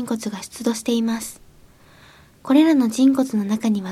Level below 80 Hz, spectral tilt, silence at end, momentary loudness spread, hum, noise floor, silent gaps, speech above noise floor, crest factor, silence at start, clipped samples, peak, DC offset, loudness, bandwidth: -58 dBFS; -5 dB/octave; 0 s; 13 LU; none; -49 dBFS; none; 30 dB; 16 dB; 0 s; under 0.1%; -4 dBFS; under 0.1%; -20 LUFS; 15 kHz